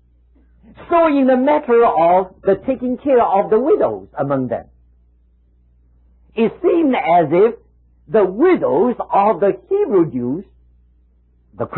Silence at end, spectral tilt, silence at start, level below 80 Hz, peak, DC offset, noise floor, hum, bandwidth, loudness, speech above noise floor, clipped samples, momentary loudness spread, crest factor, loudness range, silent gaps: 0 s; -12 dB/octave; 0.8 s; -50 dBFS; -4 dBFS; under 0.1%; -54 dBFS; none; 4.2 kHz; -16 LUFS; 39 dB; under 0.1%; 10 LU; 14 dB; 5 LU; none